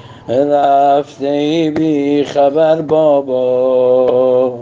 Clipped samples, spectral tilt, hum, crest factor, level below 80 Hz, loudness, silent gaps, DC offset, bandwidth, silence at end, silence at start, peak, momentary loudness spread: under 0.1%; -7 dB/octave; none; 12 dB; -58 dBFS; -12 LUFS; none; under 0.1%; 7.6 kHz; 0 s; 0.05 s; 0 dBFS; 4 LU